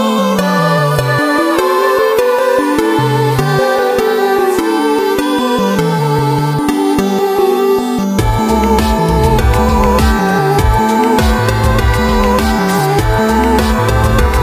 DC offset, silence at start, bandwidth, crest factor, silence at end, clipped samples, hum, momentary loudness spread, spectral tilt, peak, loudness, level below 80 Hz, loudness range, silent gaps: under 0.1%; 0 s; 15.5 kHz; 12 dB; 0 s; under 0.1%; none; 2 LU; -6 dB/octave; 0 dBFS; -12 LUFS; -20 dBFS; 1 LU; none